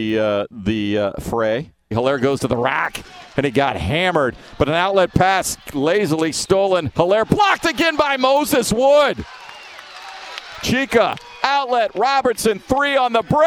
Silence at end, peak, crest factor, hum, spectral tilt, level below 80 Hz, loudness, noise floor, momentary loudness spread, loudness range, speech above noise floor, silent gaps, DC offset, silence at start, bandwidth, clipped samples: 0 s; 0 dBFS; 18 dB; none; -4.5 dB/octave; -42 dBFS; -18 LUFS; -37 dBFS; 11 LU; 4 LU; 20 dB; none; under 0.1%; 0 s; 17 kHz; under 0.1%